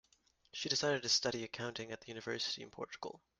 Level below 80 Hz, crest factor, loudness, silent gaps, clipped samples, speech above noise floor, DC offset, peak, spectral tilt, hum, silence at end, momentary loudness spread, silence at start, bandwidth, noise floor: -76 dBFS; 20 dB; -38 LUFS; none; under 0.1%; 34 dB; under 0.1%; -20 dBFS; -2 dB/octave; none; 0.2 s; 14 LU; 0.55 s; 11.5 kHz; -74 dBFS